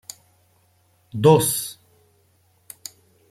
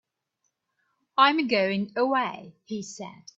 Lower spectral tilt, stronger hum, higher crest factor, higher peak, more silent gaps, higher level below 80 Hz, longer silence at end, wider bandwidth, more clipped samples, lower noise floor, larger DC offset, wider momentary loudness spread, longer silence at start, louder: about the same, -5 dB/octave vs -4.5 dB/octave; neither; about the same, 22 dB vs 22 dB; first, -2 dBFS vs -6 dBFS; neither; first, -60 dBFS vs -74 dBFS; first, 1.55 s vs 0.25 s; first, 16 kHz vs 8 kHz; neither; second, -62 dBFS vs -78 dBFS; neither; first, 25 LU vs 18 LU; about the same, 1.15 s vs 1.15 s; first, -19 LUFS vs -24 LUFS